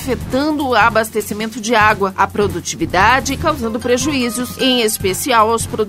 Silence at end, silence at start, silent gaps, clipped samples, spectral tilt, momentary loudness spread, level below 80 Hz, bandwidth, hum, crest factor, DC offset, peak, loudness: 0 s; 0 s; none; under 0.1%; -3.5 dB/octave; 7 LU; -36 dBFS; 16.5 kHz; none; 16 dB; under 0.1%; 0 dBFS; -15 LUFS